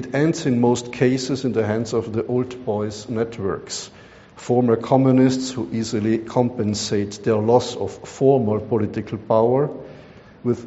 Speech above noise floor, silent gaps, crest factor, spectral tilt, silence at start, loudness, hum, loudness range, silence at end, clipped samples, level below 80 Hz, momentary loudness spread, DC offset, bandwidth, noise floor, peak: 24 dB; none; 18 dB; -6.5 dB/octave; 0 s; -21 LUFS; none; 4 LU; 0 s; under 0.1%; -54 dBFS; 11 LU; under 0.1%; 8 kHz; -44 dBFS; -2 dBFS